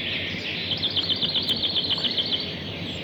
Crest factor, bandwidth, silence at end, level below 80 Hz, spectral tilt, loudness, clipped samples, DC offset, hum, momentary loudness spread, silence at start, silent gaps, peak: 14 dB; over 20 kHz; 0 s; -56 dBFS; -4 dB/octave; -24 LUFS; under 0.1%; under 0.1%; none; 7 LU; 0 s; none; -14 dBFS